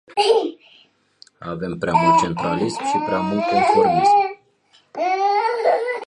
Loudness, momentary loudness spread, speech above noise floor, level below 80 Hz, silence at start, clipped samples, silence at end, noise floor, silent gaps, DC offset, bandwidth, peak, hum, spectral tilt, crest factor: -19 LUFS; 13 LU; 40 dB; -54 dBFS; 0.1 s; under 0.1%; 0 s; -58 dBFS; none; under 0.1%; 11.5 kHz; -4 dBFS; none; -5 dB/octave; 16 dB